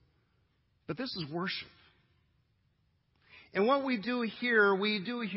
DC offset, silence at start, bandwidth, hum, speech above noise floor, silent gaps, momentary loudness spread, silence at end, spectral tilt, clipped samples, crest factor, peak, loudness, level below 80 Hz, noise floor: under 0.1%; 0.9 s; 5.8 kHz; none; 42 dB; none; 13 LU; 0 s; -8.5 dB/octave; under 0.1%; 20 dB; -14 dBFS; -31 LUFS; -74 dBFS; -74 dBFS